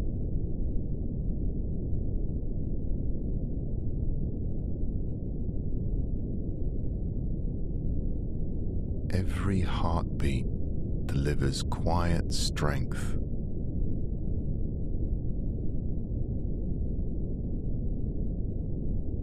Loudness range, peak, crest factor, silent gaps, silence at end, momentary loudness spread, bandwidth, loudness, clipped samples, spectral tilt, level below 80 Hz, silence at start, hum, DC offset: 4 LU; -14 dBFS; 16 dB; none; 0 s; 6 LU; 11.5 kHz; -33 LUFS; under 0.1%; -6.5 dB/octave; -32 dBFS; 0 s; none; under 0.1%